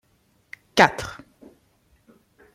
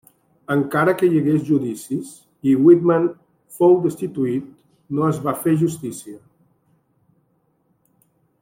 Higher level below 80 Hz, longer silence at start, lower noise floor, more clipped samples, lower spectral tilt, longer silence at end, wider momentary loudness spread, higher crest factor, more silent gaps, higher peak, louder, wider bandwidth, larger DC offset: first, -56 dBFS vs -64 dBFS; first, 0.75 s vs 0.5 s; about the same, -64 dBFS vs -65 dBFS; neither; second, -3.5 dB/octave vs -7.5 dB/octave; second, 1.4 s vs 2.25 s; first, 27 LU vs 14 LU; first, 26 dB vs 18 dB; neither; about the same, -2 dBFS vs -2 dBFS; about the same, -20 LUFS vs -19 LUFS; about the same, 16 kHz vs 16.5 kHz; neither